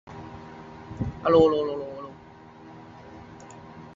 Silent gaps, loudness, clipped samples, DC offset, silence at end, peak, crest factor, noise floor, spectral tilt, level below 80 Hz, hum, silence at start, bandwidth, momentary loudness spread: none; -24 LUFS; under 0.1%; under 0.1%; 0 s; -6 dBFS; 22 dB; -48 dBFS; -7.5 dB/octave; -50 dBFS; none; 0.05 s; 7.6 kHz; 27 LU